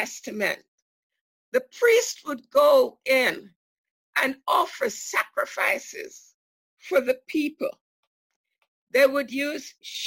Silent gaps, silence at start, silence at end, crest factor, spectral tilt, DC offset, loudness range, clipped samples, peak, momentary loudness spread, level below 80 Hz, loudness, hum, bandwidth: 0.68-1.10 s, 1.21-1.52 s, 3.56-3.84 s, 3.91-4.13 s, 6.34-6.77 s, 7.81-8.30 s, 8.36-8.44 s, 8.68-8.87 s; 0 s; 0 s; 18 dB; -2 dB/octave; under 0.1%; 6 LU; under 0.1%; -8 dBFS; 14 LU; -74 dBFS; -24 LUFS; none; 16.5 kHz